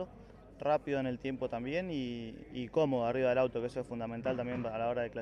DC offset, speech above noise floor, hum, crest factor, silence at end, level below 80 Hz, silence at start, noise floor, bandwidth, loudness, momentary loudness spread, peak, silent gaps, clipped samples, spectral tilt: under 0.1%; 20 dB; none; 16 dB; 0 s; -60 dBFS; 0 s; -54 dBFS; 10 kHz; -35 LUFS; 9 LU; -18 dBFS; none; under 0.1%; -7.5 dB/octave